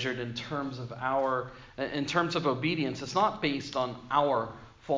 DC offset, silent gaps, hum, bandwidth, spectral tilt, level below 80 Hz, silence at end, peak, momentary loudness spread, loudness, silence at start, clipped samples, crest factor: under 0.1%; none; none; 7.6 kHz; -5.5 dB/octave; -60 dBFS; 0 s; -10 dBFS; 9 LU; -30 LUFS; 0 s; under 0.1%; 20 dB